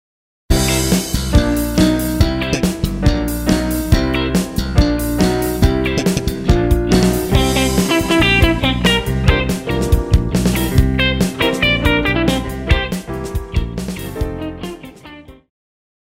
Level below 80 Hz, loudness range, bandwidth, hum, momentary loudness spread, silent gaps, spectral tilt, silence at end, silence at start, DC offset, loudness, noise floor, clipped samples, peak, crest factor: -22 dBFS; 4 LU; 16.5 kHz; none; 10 LU; none; -5 dB/octave; 0.75 s; 0.5 s; under 0.1%; -16 LUFS; -38 dBFS; under 0.1%; 0 dBFS; 16 dB